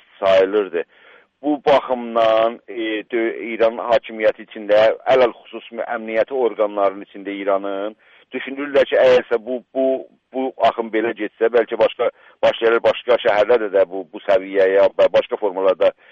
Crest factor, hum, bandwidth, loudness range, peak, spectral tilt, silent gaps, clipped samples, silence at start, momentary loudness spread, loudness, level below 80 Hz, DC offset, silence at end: 14 dB; none; 7.2 kHz; 3 LU; -4 dBFS; -5.5 dB/octave; none; under 0.1%; 0.2 s; 12 LU; -18 LUFS; -60 dBFS; under 0.1%; 0.2 s